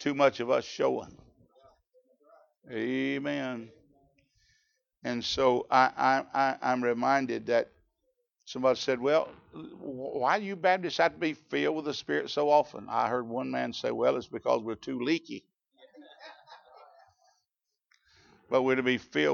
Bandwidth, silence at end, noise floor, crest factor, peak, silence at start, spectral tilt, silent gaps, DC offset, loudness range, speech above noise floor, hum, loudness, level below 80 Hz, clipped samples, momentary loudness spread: 7.2 kHz; 0 s; -86 dBFS; 22 dB; -8 dBFS; 0 s; -5 dB/octave; none; under 0.1%; 9 LU; 57 dB; none; -29 LUFS; -70 dBFS; under 0.1%; 16 LU